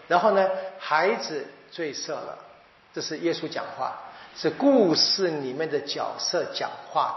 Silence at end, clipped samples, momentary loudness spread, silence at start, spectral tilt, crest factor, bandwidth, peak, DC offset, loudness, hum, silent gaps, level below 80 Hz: 0 s; under 0.1%; 15 LU; 0 s; -2 dB/octave; 20 dB; 6.2 kHz; -6 dBFS; under 0.1%; -25 LUFS; none; none; -78 dBFS